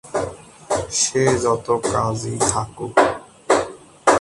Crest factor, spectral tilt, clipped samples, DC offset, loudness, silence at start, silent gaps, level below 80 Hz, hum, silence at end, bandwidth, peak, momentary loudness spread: 20 dB; -3.5 dB/octave; under 0.1%; under 0.1%; -20 LUFS; 0.05 s; none; -46 dBFS; none; 0 s; 11.5 kHz; 0 dBFS; 9 LU